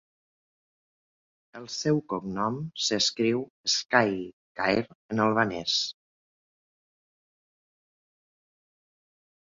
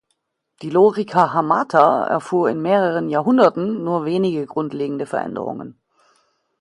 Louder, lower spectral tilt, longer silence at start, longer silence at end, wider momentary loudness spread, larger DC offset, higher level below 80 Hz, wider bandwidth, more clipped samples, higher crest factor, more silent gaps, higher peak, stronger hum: second, -27 LUFS vs -18 LUFS; second, -3.5 dB/octave vs -7.5 dB/octave; first, 1.55 s vs 0.6 s; first, 3.55 s vs 0.9 s; about the same, 10 LU vs 11 LU; neither; about the same, -64 dBFS vs -66 dBFS; second, 7.8 kHz vs 11.5 kHz; neither; first, 26 dB vs 18 dB; first, 3.50-3.64 s, 4.33-4.55 s, 4.95-5.09 s vs none; second, -6 dBFS vs 0 dBFS; neither